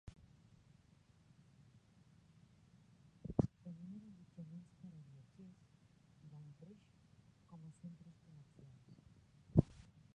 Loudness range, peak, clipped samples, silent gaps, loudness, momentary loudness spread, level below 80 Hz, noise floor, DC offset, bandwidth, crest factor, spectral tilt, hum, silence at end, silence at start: 16 LU; -16 dBFS; under 0.1%; none; -44 LUFS; 28 LU; -62 dBFS; -69 dBFS; under 0.1%; 9.4 kHz; 32 dB; -10 dB/octave; none; 0.1 s; 0.05 s